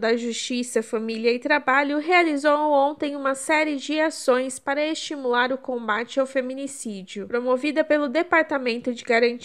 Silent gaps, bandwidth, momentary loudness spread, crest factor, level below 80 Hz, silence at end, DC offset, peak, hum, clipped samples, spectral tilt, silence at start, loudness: none; 14.5 kHz; 8 LU; 18 dB; -72 dBFS; 0 s; 0.1%; -6 dBFS; none; under 0.1%; -3 dB/octave; 0 s; -23 LUFS